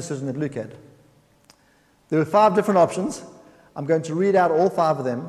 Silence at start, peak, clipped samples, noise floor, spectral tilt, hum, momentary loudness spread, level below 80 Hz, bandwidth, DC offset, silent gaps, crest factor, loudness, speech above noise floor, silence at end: 0 s; -4 dBFS; under 0.1%; -59 dBFS; -6.5 dB/octave; none; 16 LU; -64 dBFS; 13.5 kHz; under 0.1%; none; 18 dB; -21 LUFS; 39 dB; 0 s